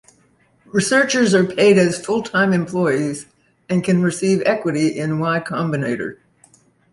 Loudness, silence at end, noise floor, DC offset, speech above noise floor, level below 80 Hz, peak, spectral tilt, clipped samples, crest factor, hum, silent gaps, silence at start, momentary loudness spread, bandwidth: -18 LUFS; 0.8 s; -58 dBFS; under 0.1%; 40 dB; -58 dBFS; -2 dBFS; -5.5 dB/octave; under 0.1%; 16 dB; none; none; 0.75 s; 9 LU; 11.5 kHz